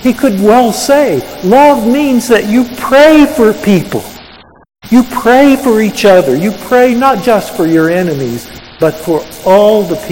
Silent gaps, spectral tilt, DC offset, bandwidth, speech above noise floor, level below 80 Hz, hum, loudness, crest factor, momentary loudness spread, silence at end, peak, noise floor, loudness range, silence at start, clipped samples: none; -5.5 dB/octave; under 0.1%; 17.5 kHz; 28 dB; -40 dBFS; none; -9 LUFS; 8 dB; 9 LU; 0 s; 0 dBFS; -36 dBFS; 3 LU; 0 s; 2%